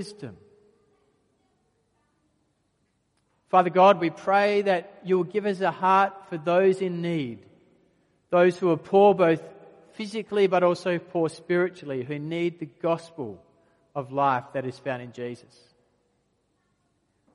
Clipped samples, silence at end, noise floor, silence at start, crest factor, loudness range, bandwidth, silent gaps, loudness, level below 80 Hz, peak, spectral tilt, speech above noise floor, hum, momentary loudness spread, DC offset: under 0.1%; 2 s; -72 dBFS; 0 s; 22 dB; 9 LU; 11 kHz; none; -24 LUFS; -74 dBFS; -4 dBFS; -7 dB/octave; 48 dB; none; 18 LU; under 0.1%